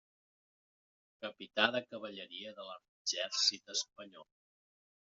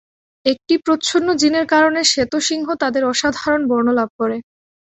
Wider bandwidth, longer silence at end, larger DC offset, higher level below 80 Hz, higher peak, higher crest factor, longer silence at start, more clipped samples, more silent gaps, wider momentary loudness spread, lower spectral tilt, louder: about the same, 7.6 kHz vs 8.2 kHz; first, 0.9 s vs 0.5 s; neither; second, -86 dBFS vs -54 dBFS; second, -14 dBFS vs -2 dBFS; first, 28 dB vs 16 dB; first, 1.2 s vs 0.45 s; neither; first, 2.88-3.05 s vs 4.10-4.19 s; first, 18 LU vs 7 LU; second, 1 dB/octave vs -2.5 dB/octave; second, -36 LUFS vs -17 LUFS